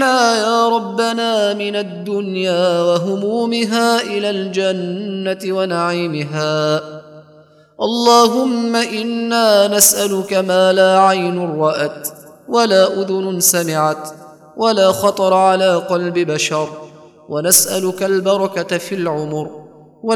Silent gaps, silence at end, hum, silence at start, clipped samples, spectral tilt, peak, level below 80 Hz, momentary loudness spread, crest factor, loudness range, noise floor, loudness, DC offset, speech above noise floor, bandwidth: none; 0 s; none; 0 s; under 0.1%; -3.5 dB/octave; 0 dBFS; -68 dBFS; 11 LU; 16 dB; 5 LU; -46 dBFS; -15 LUFS; under 0.1%; 31 dB; over 20 kHz